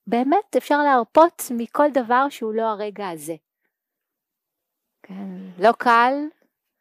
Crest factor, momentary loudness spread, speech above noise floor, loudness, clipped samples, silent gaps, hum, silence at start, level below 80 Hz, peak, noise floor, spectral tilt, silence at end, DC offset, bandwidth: 18 dB; 18 LU; 64 dB; -19 LUFS; under 0.1%; none; none; 0.05 s; -72 dBFS; -4 dBFS; -83 dBFS; -4.5 dB/octave; 0.5 s; under 0.1%; 15.5 kHz